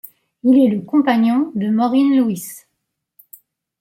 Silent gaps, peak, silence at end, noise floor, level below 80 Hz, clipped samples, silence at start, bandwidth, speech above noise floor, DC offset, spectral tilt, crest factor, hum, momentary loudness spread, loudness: none; -4 dBFS; 1.25 s; -75 dBFS; -66 dBFS; under 0.1%; 0.45 s; 16.5 kHz; 60 dB; under 0.1%; -6.5 dB/octave; 14 dB; none; 8 LU; -16 LUFS